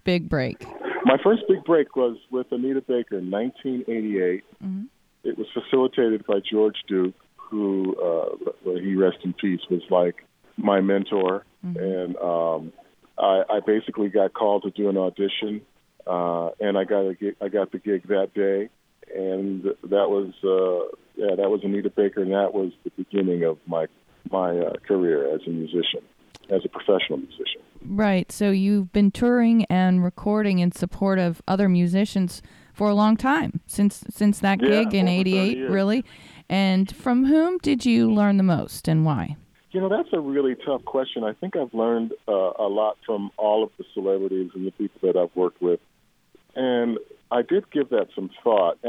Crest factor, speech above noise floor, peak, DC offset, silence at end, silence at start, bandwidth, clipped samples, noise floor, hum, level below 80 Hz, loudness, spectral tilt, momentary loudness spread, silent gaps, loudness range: 18 dB; 37 dB; -4 dBFS; under 0.1%; 0 s; 0.05 s; 13 kHz; under 0.1%; -59 dBFS; none; -54 dBFS; -23 LUFS; -7 dB/octave; 10 LU; none; 4 LU